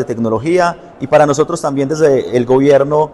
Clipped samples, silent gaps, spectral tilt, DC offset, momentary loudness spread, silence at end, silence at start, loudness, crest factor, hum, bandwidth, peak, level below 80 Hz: under 0.1%; none; -6 dB/octave; under 0.1%; 7 LU; 0 s; 0 s; -13 LUFS; 12 dB; none; 12 kHz; 0 dBFS; -48 dBFS